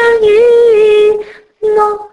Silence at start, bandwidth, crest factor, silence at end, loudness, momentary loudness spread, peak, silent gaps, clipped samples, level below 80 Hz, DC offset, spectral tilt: 0 s; 10.5 kHz; 8 dB; 0.05 s; -9 LUFS; 9 LU; 0 dBFS; none; under 0.1%; -46 dBFS; under 0.1%; -4 dB/octave